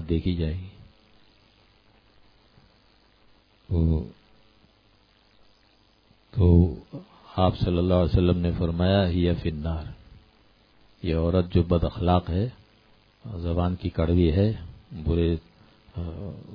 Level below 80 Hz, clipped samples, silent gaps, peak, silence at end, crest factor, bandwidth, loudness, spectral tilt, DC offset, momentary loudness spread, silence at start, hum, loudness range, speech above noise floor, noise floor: -38 dBFS; under 0.1%; none; -6 dBFS; 0 s; 20 dB; 5.2 kHz; -25 LUFS; -10.5 dB/octave; under 0.1%; 17 LU; 0 s; none; 9 LU; 38 dB; -61 dBFS